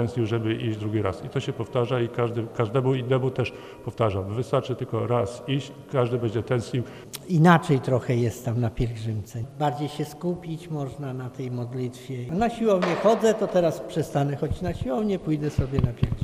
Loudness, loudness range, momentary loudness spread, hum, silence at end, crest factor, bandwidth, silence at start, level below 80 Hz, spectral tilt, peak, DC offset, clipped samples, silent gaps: -26 LUFS; 6 LU; 11 LU; none; 0 s; 22 dB; 15.5 kHz; 0 s; -46 dBFS; -7 dB/octave; -4 dBFS; under 0.1%; under 0.1%; none